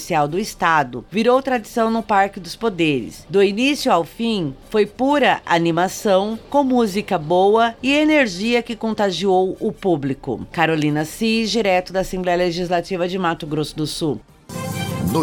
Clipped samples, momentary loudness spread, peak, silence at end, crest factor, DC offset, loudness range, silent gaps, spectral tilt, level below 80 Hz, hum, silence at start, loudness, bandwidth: under 0.1%; 8 LU; -2 dBFS; 0 s; 16 dB; under 0.1%; 3 LU; none; -5 dB/octave; -46 dBFS; none; 0 s; -19 LUFS; 18 kHz